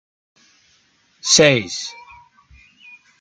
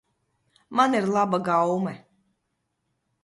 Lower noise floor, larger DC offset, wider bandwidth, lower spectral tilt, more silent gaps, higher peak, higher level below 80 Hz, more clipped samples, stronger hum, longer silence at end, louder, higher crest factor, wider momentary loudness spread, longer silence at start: second, -59 dBFS vs -77 dBFS; neither; about the same, 11 kHz vs 11.5 kHz; second, -2.5 dB/octave vs -6 dB/octave; neither; first, -2 dBFS vs -6 dBFS; first, -58 dBFS vs -70 dBFS; neither; neither; about the same, 1.3 s vs 1.25 s; first, -15 LUFS vs -24 LUFS; about the same, 20 dB vs 20 dB; first, 16 LU vs 9 LU; first, 1.25 s vs 0.7 s